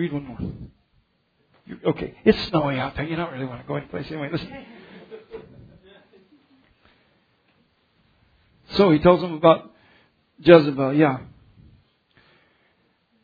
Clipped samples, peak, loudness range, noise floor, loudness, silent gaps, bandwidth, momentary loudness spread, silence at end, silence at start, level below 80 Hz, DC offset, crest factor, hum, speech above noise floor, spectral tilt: under 0.1%; 0 dBFS; 16 LU; -67 dBFS; -21 LUFS; none; 5 kHz; 27 LU; 2 s; 0 s; -50 dBFS; under 0.1%; 24 dB; none; 47 dB; -8.5 dB/octave